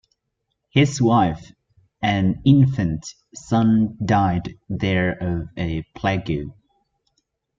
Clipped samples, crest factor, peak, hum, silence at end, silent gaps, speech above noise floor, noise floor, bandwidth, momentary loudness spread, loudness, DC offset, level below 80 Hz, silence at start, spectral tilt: under 0.1%; 18 dB; -2 dBFS; none; 1.05 s; none; 57 dB; -76 dBFS; 7.8 kHz; 13 LU; -21 LUFS; under 0.1%; -46 dBFS; 0.75 s; -6.5 dB/octave